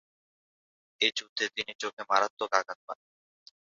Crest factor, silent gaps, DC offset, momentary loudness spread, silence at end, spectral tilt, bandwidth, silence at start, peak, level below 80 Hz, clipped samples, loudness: 28 dB; 1.29-1.36 s, 1.75-1.79 s, 1.93-1.97 s, 2.30-2.37 s, 2.75-2.88 s; under 0.1%; 14 LU; 0.7 s; 2.5 dB/octave; 7.6 kHz; 1 s; -6 dBFS; -80 dBFS; under 0.1%; -30 LUFS